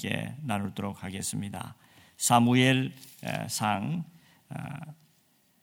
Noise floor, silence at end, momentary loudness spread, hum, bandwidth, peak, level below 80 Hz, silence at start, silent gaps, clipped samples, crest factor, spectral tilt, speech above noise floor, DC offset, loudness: -67 dBFS; 0.7 s; 20 LU; none; 18 kHz; -8 dBFS; -66 dBFS; 0 s; none; under 0.1%; 22 dB; -4.5 dB/octave; 38 dB; under 0.1%; -28 LUFS